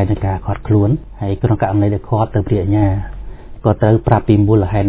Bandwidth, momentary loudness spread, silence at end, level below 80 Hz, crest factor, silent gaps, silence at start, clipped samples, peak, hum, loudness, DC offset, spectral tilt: 4 kHz; 9 LU; 0 s; -28 dBFS; 14 dB; none; 0 s; under 0.1%; 0 dBFS; none; -15 LUFS; under 0.1%; -13 dB/octave